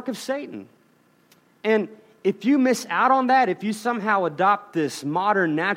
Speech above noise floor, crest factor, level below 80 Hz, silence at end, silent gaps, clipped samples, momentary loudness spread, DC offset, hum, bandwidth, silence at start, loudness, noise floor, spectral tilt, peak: 38 dB; 16 dB; -78 dBFS; 0 s; none; under 0.1%; 10 LU; under 0.1%; none; 16 kHz; 0 s; -22 LUFS; -60 dBFS; -5 dB/octave; -6 dBFS